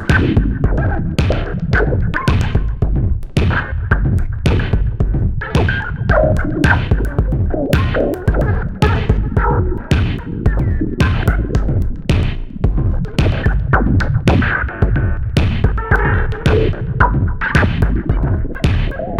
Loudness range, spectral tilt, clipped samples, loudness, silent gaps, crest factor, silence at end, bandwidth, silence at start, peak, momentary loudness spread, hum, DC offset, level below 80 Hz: 2 LU; -7.5 dB/octave; under 0.1%; -16 LUFS; none; 14 dB; 0 s; 11 kHz; 0 s; 0 dBFS; 4 LU; none; under 0.1%; -18 dBFS